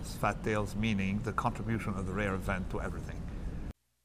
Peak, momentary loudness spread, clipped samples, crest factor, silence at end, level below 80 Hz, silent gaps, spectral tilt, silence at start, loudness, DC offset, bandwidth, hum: -16 dBFS; 10 LU; under 0.1%; 18 dB; 0.35 s; -42 dBFS; none; -6.5 dB/octave; 0 s; -35 LUFS; under 0.1%; 15.5 kHz; none